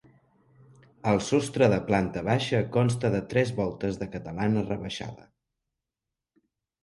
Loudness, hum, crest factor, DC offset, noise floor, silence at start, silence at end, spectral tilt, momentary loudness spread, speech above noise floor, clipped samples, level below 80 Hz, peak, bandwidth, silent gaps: -27 LUFS; none; 20 dB; under 0.1%; -88 dBFS; 1.05 s; 1.7 s; -6.5 dB/octave; 11 LU; 62 dB; under 0.1%; -54 dBFS; -8 dBFS; 11.5 kHz; none